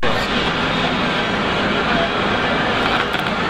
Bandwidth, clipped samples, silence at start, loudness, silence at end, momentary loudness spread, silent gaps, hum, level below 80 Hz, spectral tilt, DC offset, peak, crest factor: 15.5 kHz; under 0.1%; 0 s; -18 LUFS; 0 s; 1 LU; none; none; -36 dBFS; -5 dB/octave; under 0.1%; -4 dBFS; 14 dB